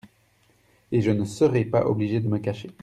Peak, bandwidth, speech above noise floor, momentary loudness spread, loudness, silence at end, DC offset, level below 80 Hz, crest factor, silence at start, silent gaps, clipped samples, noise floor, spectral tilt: -8 dBFS; 12 kHz; 39 dB; 6 LU; -24 LUFS; 0.1 s; under 0.1%; -58 dBFS; 16 dB; 0.9 s; none; under 0.1%; -62 dBFS; -8 dB/octave